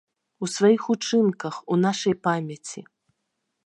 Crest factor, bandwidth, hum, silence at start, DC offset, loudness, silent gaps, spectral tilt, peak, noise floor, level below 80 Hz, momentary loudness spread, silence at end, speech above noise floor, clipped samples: 18 dB; 11.5 kHz; none; 0.4 s; under 0.1%; -23 LUFS; none; -5.5 dB/octave; -6 dBFS; -78 dBFS; -74 dBFS; 15 LU; 0.85 s; 55 dB; under 0.1%